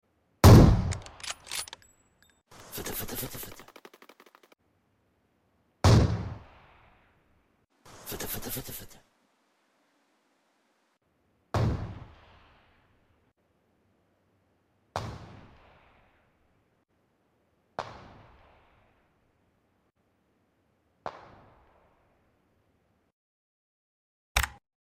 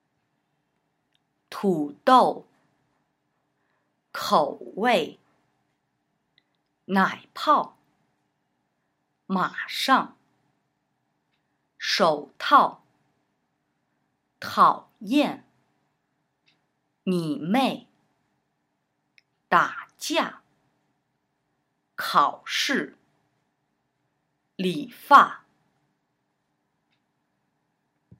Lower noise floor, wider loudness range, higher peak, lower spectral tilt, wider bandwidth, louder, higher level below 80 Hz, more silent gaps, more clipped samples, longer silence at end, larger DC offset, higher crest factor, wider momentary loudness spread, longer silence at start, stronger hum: about the same, -73 dBFS vs -76 dBFS; first, 21 LU vs 5 LU; second, -6 dBFS vs 0 dBFS; first, -6 dB/octave vs -4.5 dB/octave; about the same, 16 kHz vs 16 kHz; second, -26 LUFS vs -23 LUFS; first, -40 dBFS vs -82 dBFS; first, 23.13-24.35 s vs none; neither; second, 0.5 s vs 2.8 s; neither; about the same, 26 dB vs 26 dB; first, 24 LU vs 17 LU; second, 0.45 s vs 1.5 s; neither